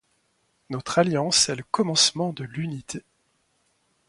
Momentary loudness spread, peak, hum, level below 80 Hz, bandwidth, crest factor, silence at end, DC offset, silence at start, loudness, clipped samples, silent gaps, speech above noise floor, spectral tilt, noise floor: 16 LU; -6 dBFS; none; -64 dBFS; 11.5 kHz; 20 dB; 1.1 s; under 0.1%; 0.7 s; -23 LUFS; under 0.1%; none; 45 dB; -3 dB/octave; -69 dBFS